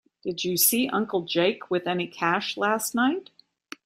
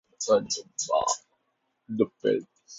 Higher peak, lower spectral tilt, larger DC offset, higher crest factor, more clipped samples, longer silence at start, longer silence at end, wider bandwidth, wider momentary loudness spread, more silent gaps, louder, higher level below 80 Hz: about the same, -6 dBFS vs -8 dBFS; about the same, -3 dB/octave vs -3 dB/octave; neither; about the same, 20 dB vs 20 dB; neither; about the same, 0.25 s vs 0.2 s; first, 0.65 s vs 0 s; first, 16 kHz vs 8 kHz; first, 10 LU vs 7 LU; neither; first, -25 LUFS vs -28 LUFS; about the same, -72 dBFS vs -68 dBFS